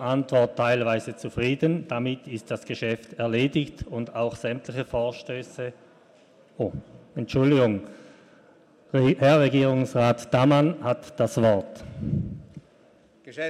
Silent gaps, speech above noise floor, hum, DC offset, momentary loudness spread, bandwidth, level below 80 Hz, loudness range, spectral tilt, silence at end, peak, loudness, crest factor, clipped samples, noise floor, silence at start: none; 33 dB; none; under 0.1%; 15 LU; 12.5 kHz; -52 dBFS; 8 LU; -7 dB/octave; 0 s; -8 dBFS; -25 LUFS; 18 dB; under 0.1%; -57 dBFS; 0 s